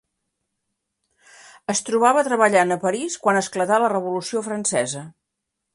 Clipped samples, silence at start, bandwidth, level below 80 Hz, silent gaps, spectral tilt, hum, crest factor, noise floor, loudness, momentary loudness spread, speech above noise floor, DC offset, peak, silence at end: under 0.1%; 1.7 s; 11.5 kHz; -70 dBFS; none; -3.5 dB/octave; none; 20 dB; -80 dBFS; -20 LUFS; 9 LU; 60 dB; under 0.1%; -4 dBFS; 0.65 s